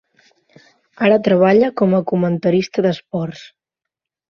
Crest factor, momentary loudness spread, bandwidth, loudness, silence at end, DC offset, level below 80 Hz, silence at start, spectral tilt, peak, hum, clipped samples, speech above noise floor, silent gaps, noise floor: 16 dB; 12 LU; 6.8 kHz; -16 LUFS; 0.9 s; under 0.1%; -58 dBFS; 1 s; -7.5 dB/octave; -2 dBFS; none; under 0.1%; 68 dB; none; -84 dBFS